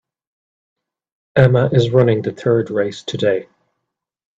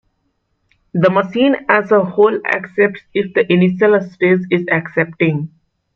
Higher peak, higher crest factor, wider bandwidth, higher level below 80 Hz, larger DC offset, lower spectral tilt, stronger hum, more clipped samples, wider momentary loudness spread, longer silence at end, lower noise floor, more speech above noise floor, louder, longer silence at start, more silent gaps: about the same, 0 dBFS vs -2 dBFS; about the same, 18 dB vs 14 dB; first, 7.6 kHz vs 6.4 kHz; first, -52 dBFS vs -60 dBFS; neither; about the same, -7.5 dB/octave vs -8.5 dB/octave; neither; neither; about the same, 8 LU vs 6 LU; first, 0.95 s vs 0.5 s; first, -78 dBFS vs -66 dBFS; first, 63 dB vs 52 dB; about the same, -16 LUFS vs -15 LUFS; first, 1.35 s vs 0.95 s; neither